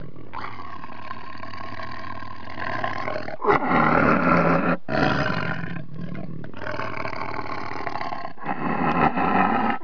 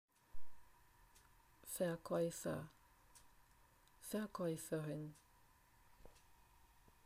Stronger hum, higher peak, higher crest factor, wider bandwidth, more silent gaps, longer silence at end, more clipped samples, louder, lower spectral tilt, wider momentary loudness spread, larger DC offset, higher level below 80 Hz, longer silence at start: neither; first, -2 dBFS vs -30 dBFS; about the same, 22 dB vs 18 dB; second, 5.4 kHz vs 15.5 kHz; neither; about the same, 0 s vs 0 s; neither; first, -24 LUFS vs -45 LUFS; first, -7.5 dB/octave vs -5.5 dB/octave; second, 18 LU vs 24 LU; first, 4% vs under 0.1%; first, -50 dBFS vs -70 dBFS; second, 0 s vs 0.2 s